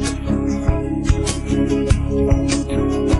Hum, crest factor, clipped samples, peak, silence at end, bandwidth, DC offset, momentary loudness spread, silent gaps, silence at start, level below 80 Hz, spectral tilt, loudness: none; 16 dB; under 0.1%; -2 dBFS; 0 s; 11.5 kHz; under 0.1%; 3 LU; none; 0 s; -24 dBFS; -6 dB/octave; -19 LUFS